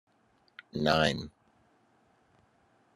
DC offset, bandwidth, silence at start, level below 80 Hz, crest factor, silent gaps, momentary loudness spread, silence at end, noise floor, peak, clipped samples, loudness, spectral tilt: under 0.1%; 13 kHz; 0.75 s; -60 dBFS; 26 dB; none; 22 LU; 1.65 s; -69 dBFS; -10 dBFS; under 0.1%; -29 LUFS; -5 dB/octave